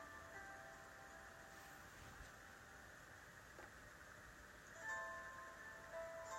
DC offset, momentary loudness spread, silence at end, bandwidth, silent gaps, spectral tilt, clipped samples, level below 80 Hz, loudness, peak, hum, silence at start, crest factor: under 0.1%; 10 LU; 0 s; 16 kHz; none; -3 dB/octave; under 0.1%; -72 dBFS; -56 LUFS; -38 dBFS; none; 0 s; 18 dB